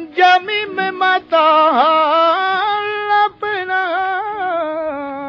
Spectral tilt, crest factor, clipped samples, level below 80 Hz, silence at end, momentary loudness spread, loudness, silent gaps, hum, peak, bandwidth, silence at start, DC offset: -4 dB/octave; 14 dB; under 0.1%; -62 dBFS; 0 s; 9 LU; -15 LUFS; none; none; -2 dBFS; 7 kHz; 0 s; under 0.1%